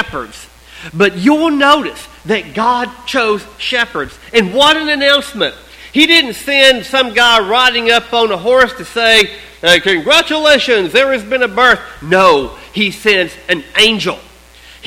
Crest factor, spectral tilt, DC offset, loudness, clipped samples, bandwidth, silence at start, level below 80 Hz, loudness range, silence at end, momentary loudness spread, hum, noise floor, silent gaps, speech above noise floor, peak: 12 dB; -3 dB/octave; under 0.1%; -11 LUFS; 0.3%; 17 kHz; 0 s; -42 dBFS; 4 LU; 0 s; 9 LU; none; -39 dBFS; none; 27 dB; 0 dBFS